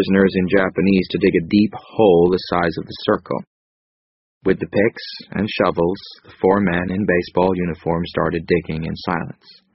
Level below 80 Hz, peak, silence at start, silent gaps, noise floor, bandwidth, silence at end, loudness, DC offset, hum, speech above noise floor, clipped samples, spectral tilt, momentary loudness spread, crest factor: -46 dBFS; -2 dBFS; 0 s; 3.47-4.41 s; under -90 dBFS; 5.8 kHz; 0.4 s; -19 LUFS; under 0.1%; none; over 72 dB; under 0.1%; -5.5 dB/octave; 10 LU; 18 dB